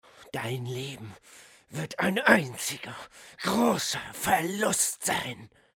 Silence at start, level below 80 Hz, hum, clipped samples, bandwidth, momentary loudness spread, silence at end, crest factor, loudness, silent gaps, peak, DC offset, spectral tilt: 0.2 s; -64 dBFS; none; under 0.1%; 19 kHz; 18 LU; 0.3 s; 24 dB; -27 LUFS; none; -4 dBFS; under 0.1%; -3 dB/octave